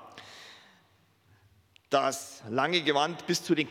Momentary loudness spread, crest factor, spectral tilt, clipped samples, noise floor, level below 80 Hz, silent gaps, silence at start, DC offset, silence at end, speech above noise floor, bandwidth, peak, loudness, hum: 22 LU; 22 dB; -3.5 dB/octave; under 0.1%; -65 dBFS; -82 dBFS; none; 0 s; under 0.1%; 0 s; 37 dB; 17 kHz; -8 dBFS; -29 LUFS; none